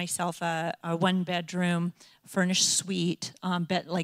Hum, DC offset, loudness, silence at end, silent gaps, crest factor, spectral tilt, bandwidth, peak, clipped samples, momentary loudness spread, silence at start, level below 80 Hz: none; under 0.1%; -28 LUFS; 0 s; none; 18 dB; -3.5 dB/octave; 15 kHz; -12 dBFS; under 0.1%; 8 LU; 0 s; -72 dBFS